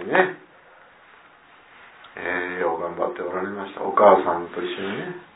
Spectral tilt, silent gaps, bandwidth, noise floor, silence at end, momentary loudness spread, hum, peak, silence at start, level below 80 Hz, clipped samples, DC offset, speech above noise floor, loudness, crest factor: -9 dB/octave; none; 4 kHz; -51 dBFS; 0.1 s; 16 LU; none; -2 dBFS; 0 s; -68 dBFS; under 0.1%; under 0.1%; 30 dB; -23 LUFS; 22 dB